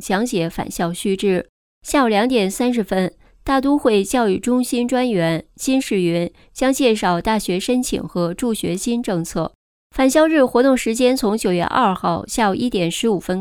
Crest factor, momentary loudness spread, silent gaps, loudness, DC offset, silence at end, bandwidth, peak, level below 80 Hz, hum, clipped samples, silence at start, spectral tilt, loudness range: 16 dB; 8 LU; 1.49-1.81 s, 9.55-9.90 s; -19 LUFS; under 0.1%; 0 s; 18 kHz; -2 dBFS; -44 dBFS; none; under 0.1%; 0 s; -5 dB/octave; 3 LU